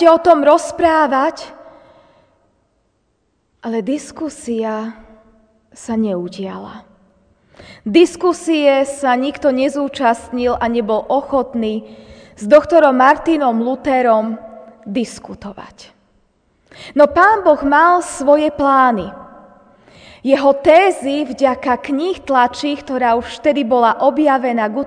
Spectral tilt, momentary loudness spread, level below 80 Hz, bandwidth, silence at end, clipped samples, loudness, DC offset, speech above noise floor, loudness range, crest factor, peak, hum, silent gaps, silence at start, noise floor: -4.5 dB/octave; 16 LU; -48 dBFS; 10 kHz; 0 s; under 0.1%; -15 LUFS; under 0.1%; 49 dB; 11 LU; 16 dB; 0 dBFS; none; none; 0 s; -64 dBFS